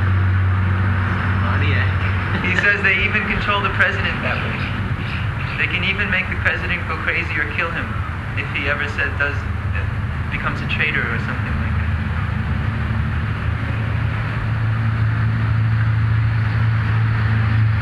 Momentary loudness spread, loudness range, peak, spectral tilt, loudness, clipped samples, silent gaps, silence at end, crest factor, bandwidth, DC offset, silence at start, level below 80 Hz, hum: 6 LU; 4 LU; -2 dBFS; -7 dB/octave; -19 LUFS; under 0.1%; none; 0 s; 16 dB; 7.2 kHz; under 0.1%; 0 s; -30 dBFS; none